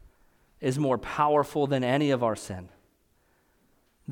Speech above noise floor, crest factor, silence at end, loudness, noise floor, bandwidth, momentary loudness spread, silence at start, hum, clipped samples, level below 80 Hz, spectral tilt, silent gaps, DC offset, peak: 41 dB; 18 dB; 0 s; -27 LUFS; -67 dBFS; 18 kHz; 14 LU; 0.6 s; none; under 0.1%; -60 dBFS; -6.5 dB/octave; none; under 0.1%; -10 dBFS